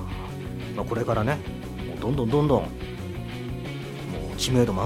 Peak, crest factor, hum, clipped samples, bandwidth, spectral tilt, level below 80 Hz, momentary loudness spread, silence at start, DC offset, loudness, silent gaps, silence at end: -6 dBFS; 20 dB; none; under 0.1%; 16.5 kHz; -6 dB/octave; -40 dBFS; 12 LU; 0 s; under 0.1%; -28 LUFS; none; 0 s